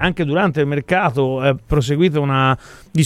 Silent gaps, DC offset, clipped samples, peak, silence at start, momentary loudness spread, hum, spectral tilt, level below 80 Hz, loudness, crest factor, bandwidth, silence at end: none; under 0.1%; under 0.1%; -2 dBFS; 0 s; 3 LU; none; -6.5 dB/octave; -36 dBFS; -17 LUFS; 16 dB; 12 kHz; 0 s